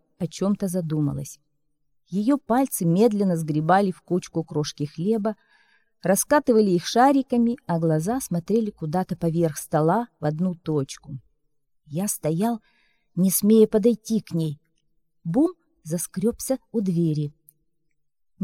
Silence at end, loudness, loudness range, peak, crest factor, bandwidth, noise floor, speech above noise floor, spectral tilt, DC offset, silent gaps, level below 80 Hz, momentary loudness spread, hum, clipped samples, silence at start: 0 s; -23 LUFS; 5 LU; -6 dBFS; 18 dB; 16.5 kHz; -76 dBFS; 53 dB; -6 dB/octave; under 0.1%; none; -58 dBFS; 13 LU; none; under 0.1%; 0.2 s